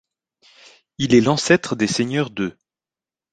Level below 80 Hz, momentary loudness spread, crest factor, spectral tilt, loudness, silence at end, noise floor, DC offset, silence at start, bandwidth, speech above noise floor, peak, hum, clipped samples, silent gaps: -56 dBFS; 11 LU; 20 dB; -5 dB/octave; -19 LUFS; 0.8 s; under -90 dBFS; under 0.1%; 1 s; 9.4 kHz; over 72 dB; -2 dBFS; none; under 0.1%; none